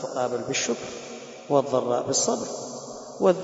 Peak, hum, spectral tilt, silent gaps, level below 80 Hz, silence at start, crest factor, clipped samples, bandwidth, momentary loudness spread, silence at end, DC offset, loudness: -6 dBFS; none; -3.5 dB/octave; none; -66 dBFS; 0 s; 20 dB; under 0.1%; 8 kHz; 15 LU; 0 s; under 0.1%; -26 LUFS